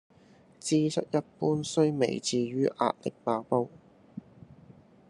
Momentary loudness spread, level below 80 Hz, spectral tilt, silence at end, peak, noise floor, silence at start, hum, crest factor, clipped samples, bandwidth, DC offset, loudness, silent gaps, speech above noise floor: 15 LU; -72 dBFS; -5.5 dB/octave; 0.9 s; -10 dBFS; -58 dBFS; 0.65 s; none; 20 dB; under 0.1%; 11.5 kHz; under 0.1%; -29 LUFS; none; 30 dB